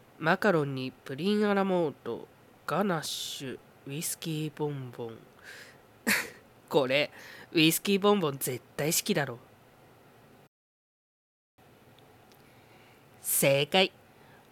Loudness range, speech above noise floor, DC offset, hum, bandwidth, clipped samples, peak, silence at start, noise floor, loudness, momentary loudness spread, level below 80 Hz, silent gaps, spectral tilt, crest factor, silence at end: 7 LU; 29 dB; under 0.1%; none; 18 kHz; under 0.1%; -10 dBFS; 0.2 s; -58 dBFS; -29 LUFS; 18 LU; -74 dBFS; 10.48-11.58 s; -3.5 dB/octave; 22 dB; 0.65 s